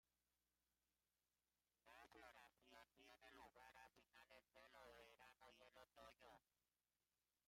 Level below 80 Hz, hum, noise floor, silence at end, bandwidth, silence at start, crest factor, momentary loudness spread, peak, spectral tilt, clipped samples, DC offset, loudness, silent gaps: -90 dBFS; 60 Hz at -90 dBFS; under -90 dBFS; 0.45 s; 16 kHz; 0.05 s; 18 dB; 3 LU; -54 dBFS; -2.5 dB/octave; under 0.1%; under 0.1%; -68 LUFS; none